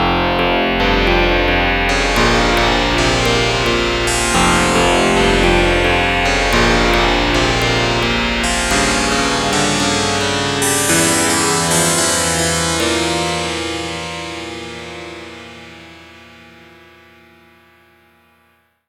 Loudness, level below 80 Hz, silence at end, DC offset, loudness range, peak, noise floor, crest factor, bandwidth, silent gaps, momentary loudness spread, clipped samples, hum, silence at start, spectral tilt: -14 LUFS; -26 dBFS; 2.7 s; under 0.1%; 12 LU; 0 dBFS; -57 dBFS; 16 dB; 16.5 kHz; none; 11 LU; under 0.1%; none; 0 s; -3 dB/octave